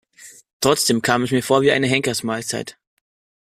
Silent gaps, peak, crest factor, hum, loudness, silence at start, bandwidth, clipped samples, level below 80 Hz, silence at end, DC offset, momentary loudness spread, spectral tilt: 0.53-0.60 s; -2 dBFS; 18 dB; none; -19 LUFS; 0.2 s; 15.5 kHz; under 0.1%; -56 dBFS; 0.85 s; under 0.1%; 10 LU; -3.5 dB/octave